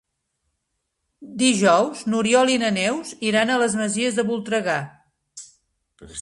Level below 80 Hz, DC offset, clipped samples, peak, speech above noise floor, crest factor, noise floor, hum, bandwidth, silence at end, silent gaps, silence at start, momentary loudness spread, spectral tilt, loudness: -62 dBFS; under 0.1%; under 0.1%; -4 dBFS; 56 dB; 18 dB; -77 dBFS; none; 11.5 kHz; 0 s; none; 1.2 s; 21 LU; -3.5 dB/octave; -20 LUFS